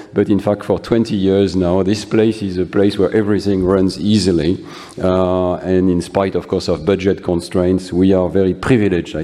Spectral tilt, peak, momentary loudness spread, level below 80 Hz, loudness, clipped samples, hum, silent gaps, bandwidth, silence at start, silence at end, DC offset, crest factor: -7 dB/octave; 0 dBFS; 4 LU; -40 dBFS; -16 LUFS; under 0.1%; none; none; 12 kHz; 0 s; 0 s; under 0.1%; 14 dB